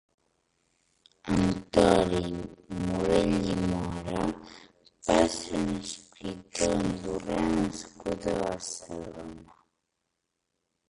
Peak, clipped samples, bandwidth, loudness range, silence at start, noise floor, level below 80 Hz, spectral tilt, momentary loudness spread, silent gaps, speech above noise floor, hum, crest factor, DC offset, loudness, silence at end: -6 dBFS; under 0.1%; 11.5 kHz; 6 LU; 1.25 s; -82 dBFS; -48 dBFS; -5.5 dB/octave; 15 LU; none; 52 dB; none; 24 dB; under 0.1%; -29 LUFS; 1.45 s